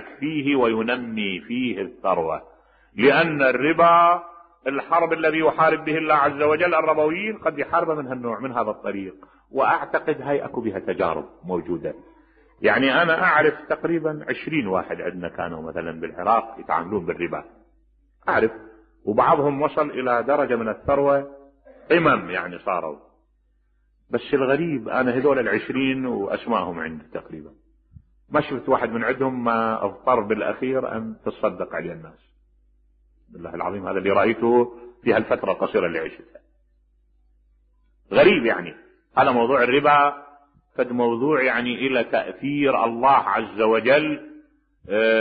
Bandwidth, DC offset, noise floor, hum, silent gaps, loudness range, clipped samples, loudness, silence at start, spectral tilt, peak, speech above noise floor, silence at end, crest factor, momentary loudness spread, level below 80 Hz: 4.9 kHz; under 0.1%; -64 dBFS; none; none; 6 LU; under 0.1%; -22 LUFS; 0 s; -10 dB/octave; -4 dBFS; 42 dB; 0 s; 18 dB; 13 LU; -58 dBFS